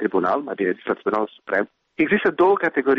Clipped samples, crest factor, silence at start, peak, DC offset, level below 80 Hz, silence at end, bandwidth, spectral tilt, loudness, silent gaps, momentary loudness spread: under 0.1%; 14 dB; 0 s; -8 dBFS; under 0.1%; -62 dBFS; 0 s; 5.8 kHz; -8 dB/octave; -21 LUFS; none; 7 LU